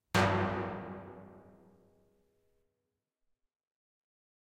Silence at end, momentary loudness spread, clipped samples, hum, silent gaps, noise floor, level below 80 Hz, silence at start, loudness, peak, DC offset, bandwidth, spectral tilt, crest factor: 3.05 s; 24 LU; under 0.1%; none; none; -87 dBFS; -62 dBFS; 0.15 s; -33 LUFS; -14 dBFS; under 0.1%; 15.5 kHz; -5.5 dB/octave; 24 dB